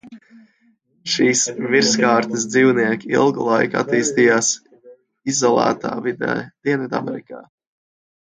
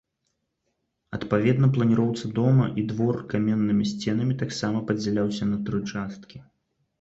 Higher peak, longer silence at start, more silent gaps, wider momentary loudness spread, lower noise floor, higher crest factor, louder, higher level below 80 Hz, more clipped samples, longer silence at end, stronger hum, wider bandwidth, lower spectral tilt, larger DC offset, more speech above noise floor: first, -2 dBFS vs -8 dBFS; second, 0.05 s vs 1.1 s; neither; about the same, 10 LU vs 10 LU; second, -60 dBFS vs -77 dBFS; about the same, 18 dB vs 16 dB; first, -18 LUFS vs -24 LUFS; second, -64 dBFS vs -56 dBFS; neither; first, 0.9 s vs 0.6 s; neither; first, 9.6 kHz vs 8 kHz; second, -3.5 dB/octave vs -7.5 dB/octave; neither; second, 43 dB vs 53 dB